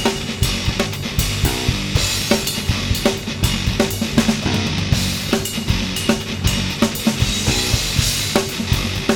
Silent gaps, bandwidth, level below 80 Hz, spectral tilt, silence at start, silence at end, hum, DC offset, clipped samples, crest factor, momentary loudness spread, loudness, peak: none; over 20 kHz; -28 dBFS; -4 dB/octave; 0 s; 0 s; none; under 0.1%; under 0.1%; 18 dB; 3 LU; -19 LUFS; 0 dBFS